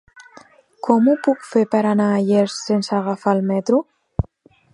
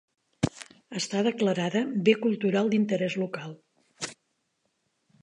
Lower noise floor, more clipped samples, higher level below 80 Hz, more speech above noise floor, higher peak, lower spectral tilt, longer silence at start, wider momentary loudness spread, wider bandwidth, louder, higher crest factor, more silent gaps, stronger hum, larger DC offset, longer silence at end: second, -52 dBFS vs -76 dBFS; neither; first, -42 dBFS vs -62 dBFS; second, 34 dB vs 50 dB; first, 0 dBFS vs -8 dBFS; about the same, -6.5 dB/octave vs -5.5 dB/octave; second, 0.15 s vs 0.4 s; second, 11 LU vs 14 LU; about the same, 11 kHz vs 11 kHz; first, -19 LUFS vs -27 LUFS; about the same, 18 dB vs 22 dB; neither; neither; neither; second, 0.5 s vs 1.1 s